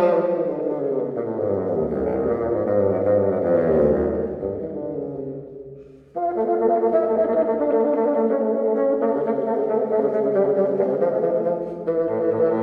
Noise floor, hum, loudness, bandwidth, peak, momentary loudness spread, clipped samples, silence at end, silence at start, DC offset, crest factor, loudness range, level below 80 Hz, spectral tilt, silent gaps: -42 dBFS; none; -21 LUFS; 4.4 kHz; -6 dBFS; 9 LU; under 0.1%; 0 s; 0 s; under 0.1%; 14 dB; 3 LU; -48 dBFS; -11 dB/octave; none